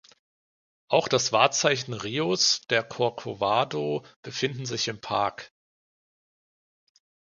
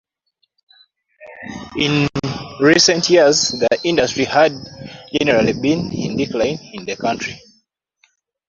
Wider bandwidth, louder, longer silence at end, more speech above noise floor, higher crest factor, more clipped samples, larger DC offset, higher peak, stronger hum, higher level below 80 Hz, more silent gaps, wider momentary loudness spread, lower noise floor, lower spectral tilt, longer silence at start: first, 10.5 kHz vs 7.8 kHz; second, -25 LUFS vs -16 LUFS; first, 1.95 s vs 1.1 s; first, over 64 dB vs 52 dB; first, 24 dB vs 18 dB; neither; neither; about the same, -4 dBFS vs -2 dBFS; neither; second, -66 dBFS vs -48 dBFS; first, 4.16-4.23 s vs none; second, 9 LU vs 19 LU; first, under -90 dBFS vs -68 dBFS; about the same, -3 dB/octave vs -3.5 dB/octave; second, 0.9 s vs 1.2 s